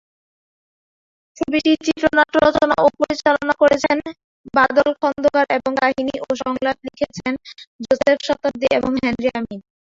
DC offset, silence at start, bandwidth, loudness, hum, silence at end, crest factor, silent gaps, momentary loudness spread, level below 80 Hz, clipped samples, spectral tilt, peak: under 0.1%; 1.4 s; 7.8 kHz; -18 LUFS; none; 0.35 s; 18 dB; 4.24-4.44 s, 7.67-7.79 s; 11 LU; -50 dBFS; under 0.1%; -4.5 dB/octave; -2 dBFS